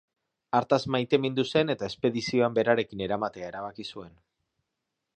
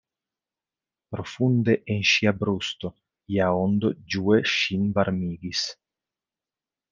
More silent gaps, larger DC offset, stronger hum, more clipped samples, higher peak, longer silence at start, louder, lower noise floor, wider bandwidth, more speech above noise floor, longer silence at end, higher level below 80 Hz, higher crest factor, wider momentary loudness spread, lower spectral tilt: neither; neither; neither; neither; about the same, -8 dBFS vs -6 dBFS; second, 0.55 s vs 1.1 s; second, -27 LUFS vs -24 LUFS; second, -84 dBFS vs under -90 dBFS; first, 9.2 kHz vs 7.4 kHz; second, 56 dB vs over 66 dB; about the same, 1.1 s vs 1.2 s; about the same, -64 dBFS vs -62 dBFS; about the same, 22 dB vs 20 dB; about the same, 12 LU vs 12 LU; about the same, -6 dB/octave vs -5.5 dB/octave